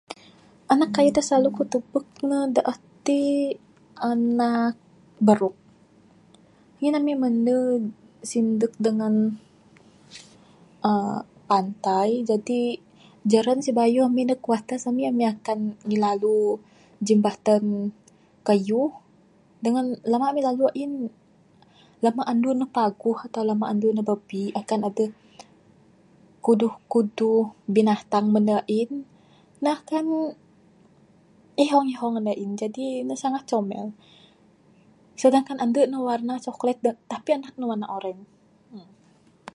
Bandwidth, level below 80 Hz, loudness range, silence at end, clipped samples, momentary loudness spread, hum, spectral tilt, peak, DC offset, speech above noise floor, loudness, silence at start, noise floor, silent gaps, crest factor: 11.5 kHz; -70 dBFS; 4 LU; 0.75 s; under 0.1%; 10 LU; none; -6 dB/octave; -4 dBFS; under 0.1%; 35 dB; -24 LUFS; 0.1 s; -58 dBFS; none; 22 dB